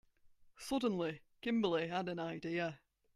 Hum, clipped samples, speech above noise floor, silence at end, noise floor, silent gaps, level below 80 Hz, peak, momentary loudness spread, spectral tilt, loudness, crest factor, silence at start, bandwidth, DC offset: none; under 0.1%; 28 dB; 0.4 s; -66 dBFS; none; -70 dBFS; -22 dBFS; 9 LU; -5.5 dB/octave; -39 LUFS; 18 dB; 0.45 s; 14 kHz; under 0.1%